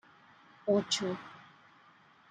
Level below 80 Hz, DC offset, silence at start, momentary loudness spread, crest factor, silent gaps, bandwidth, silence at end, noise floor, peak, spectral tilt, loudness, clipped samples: -80 dBFS; under 0.1%; 0.65 s; 22 LU; 20 dB; none; 9.8 kHz; 0.9 s; -62 dBFS; -16 dBFS; -4 dB/octave; -33 LUFS; under 0.1%